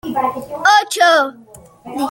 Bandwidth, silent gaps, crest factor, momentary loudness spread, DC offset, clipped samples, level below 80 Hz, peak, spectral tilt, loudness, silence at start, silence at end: 17 kHz; none; 16 dB; 12 LU; under 0.1%; under 0.1%; -56 dBFS; 0 dBFS; -2 dB/octave; -14 LUFS; 0.05 s; 0 s